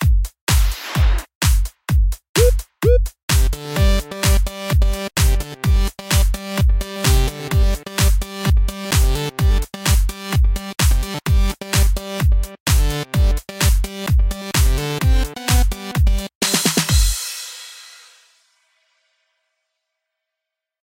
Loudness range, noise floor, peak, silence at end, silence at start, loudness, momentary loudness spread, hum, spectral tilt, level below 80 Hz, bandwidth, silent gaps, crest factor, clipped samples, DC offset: 2 LU; -83 dBFS; -2 dBFS; 3.05 s; 0 s; -19 LUFS; 4 LU; none; -4.5 dB/octave; -18 dBFS; 17 kHz; 0.41-0.47 s, 1.35-1.41 s, 2.29-2.34 s, 3.23-3.28 s, 12.60-12.66 s, 16.35-16.41 s; 16 dB; under 0.1%; under 0.1%